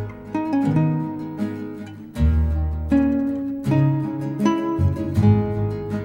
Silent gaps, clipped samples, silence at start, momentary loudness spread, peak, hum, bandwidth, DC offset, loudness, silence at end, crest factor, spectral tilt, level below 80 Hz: none; under 0.1%; 0 s; 10 LU; -4 dBFS; none; 16 kHz; under 0.1%; -22 LUFS; 0 s; 16 dB; -9 dB/octave; -30 dBFS